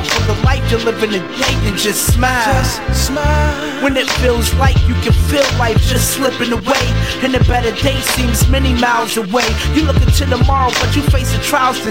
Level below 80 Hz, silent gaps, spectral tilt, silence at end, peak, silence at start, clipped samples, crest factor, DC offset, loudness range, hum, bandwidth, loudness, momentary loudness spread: -18 dBFS; none; -4.5 dB/octave; 0 s; -2 dBFS; 0 s; under 0.1%; 12 dB; 0.9%; 1 LU; none; 16.5 kHz; -14 LUFS; 3 LU